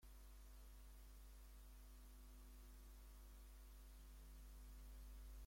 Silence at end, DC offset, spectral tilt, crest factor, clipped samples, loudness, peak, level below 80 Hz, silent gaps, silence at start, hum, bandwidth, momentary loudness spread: 0 s; under 0.1%; -4.5 dB/octave; 10 dB; under 0.1%; -64 LUFS; -50 dBFS; -60 dBFS; none; 0 s; none; 16.5 kHz; 3 LU